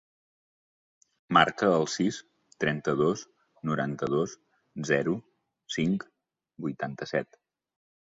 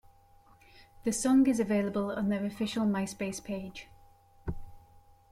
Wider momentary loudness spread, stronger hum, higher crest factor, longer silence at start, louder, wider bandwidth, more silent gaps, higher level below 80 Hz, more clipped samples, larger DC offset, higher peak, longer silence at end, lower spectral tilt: second, 14 LU vs 18 LU; neither; first, 24 dB vs 16 dB; first, 1.3 s vs 0.8 s; about the same, -29 LUFS vs -31 LUFS; second, 7.8 kHz vs 15 kHz; neither; second, -66 dBFS vs -54 dBFS; neither; neither; first, -6 dBFS vs -16 dBFS; first, 0.85 s vs 0.5 s; about the same, -5 dB/octave vs -5.5 dB/octave